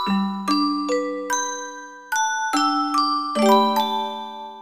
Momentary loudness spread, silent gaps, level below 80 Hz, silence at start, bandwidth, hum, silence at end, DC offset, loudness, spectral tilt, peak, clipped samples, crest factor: 14 LU; none; -76 dBFS; 0 s; 15.5 kHz; none; 0 s; 0.2%; -21 LUFS; -3.5 dB/octave; -4 dBFS; under 0.1%; 16 dB